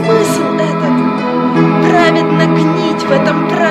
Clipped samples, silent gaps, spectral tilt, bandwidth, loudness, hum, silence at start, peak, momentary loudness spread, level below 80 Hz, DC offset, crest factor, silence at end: under 0.1%; none; -6.5 dB/octave; 13.5 kHz; -11 LUFS; none; 0 s; 0 dBFS; 5 LU; -50 dBFS; under 0.1%; 10 dB; 0 s